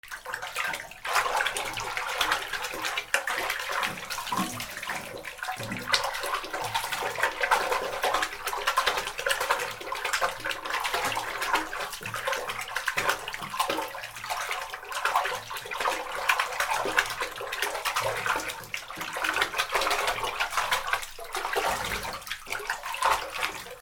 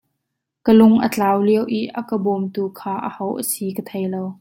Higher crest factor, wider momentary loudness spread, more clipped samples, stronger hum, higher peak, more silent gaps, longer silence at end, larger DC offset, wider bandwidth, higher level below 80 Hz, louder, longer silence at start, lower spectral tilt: first, 26 dB vs 16 dB; second, 8 LU vs 13 LU; neither; neither; about the same, -4 dBFS vs -2 dBFS; neither; about the same, 0 s vs 0.05 s; neither; first, over 20 kHz vs 16.5 kHz; about the same, -54 dBFS vs -58 dBFS; second, -29 LUFS vs -19 LUFS; second, 0.05 s vs 0.65 s; second, -1 dB/octave vs -6 dB/octave